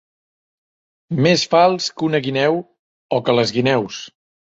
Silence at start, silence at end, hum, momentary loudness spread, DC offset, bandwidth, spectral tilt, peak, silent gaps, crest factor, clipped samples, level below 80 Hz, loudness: 1.1 s; 0.45 s; none; 12 LU; under 0.1%; 8 kHz; -5 dB/octave; -2 dBFS; 2.79-3.09 s; 18 dB; under 0.1%; -60 dBFS; -17 LUFS